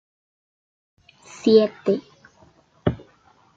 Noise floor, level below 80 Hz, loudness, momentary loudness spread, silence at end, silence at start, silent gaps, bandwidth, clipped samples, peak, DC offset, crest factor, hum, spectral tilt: -57 dBFS; -54 dBFS; -21 LUFS; 10 LU; 0.6 s; 1.45 s; none; 7.8 kHz; under 0.1%; -2 dBFS; under 0.1%; 22 dB; none; -7 dB/octave